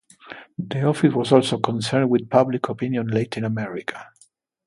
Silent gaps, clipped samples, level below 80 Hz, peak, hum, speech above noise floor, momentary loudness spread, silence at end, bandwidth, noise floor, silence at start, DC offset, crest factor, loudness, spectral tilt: none; under 0.1%; -62 dBFS; 0 dBFS; none; 38 dB; 16 LU; 0.6 s; 11.5 kHz; -59 dBFS; 0.25 s; under 0.1%; 22 dB; -21 LUFS; -6.5 dB/octave